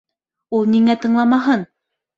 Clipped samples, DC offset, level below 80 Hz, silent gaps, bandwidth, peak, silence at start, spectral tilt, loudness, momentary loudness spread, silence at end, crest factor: under 0.1%; under 0.1%; -62 dBFS; none; 7.2 kHz; -4 dBFS; 0.5 s; -7 dB/octave; -16 LUFS; 8 LU; 0.55 s; 14 dB